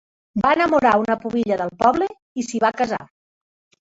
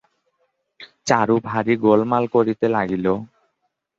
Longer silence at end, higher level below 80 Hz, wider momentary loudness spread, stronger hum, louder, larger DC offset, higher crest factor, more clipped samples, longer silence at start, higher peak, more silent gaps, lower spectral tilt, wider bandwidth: about the same, 0.85 s vs 0.75 s; about the same, -54 dBFS vs -56 dBFS; first, 11 LU vs 6 LU; neither; about the same, -20 LUFS vs -19 LUFS; neither; about the same, 18 dB vs 20 dB; neither; second, 0.35 s vs 0.8 s; about the same, -2 dBFS vs -2 dBFS; first, 2.22-2.35 s vs none; about the same, -5 dB/octave vs -6 dB/octave; about the same, 8 kHz vs 7.8 kHz